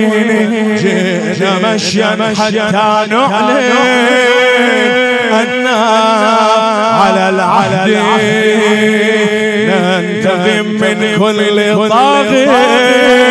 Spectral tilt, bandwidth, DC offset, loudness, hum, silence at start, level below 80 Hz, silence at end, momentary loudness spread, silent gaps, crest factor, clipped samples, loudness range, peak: -4.5 dB/octave; 11 kHz; under 0.1%; -9 LUFS; none; 0 s; -52 dBFS; 0 s; 4 LU; none; 10 dB; 0.1%; 2 LU; 0 dBFS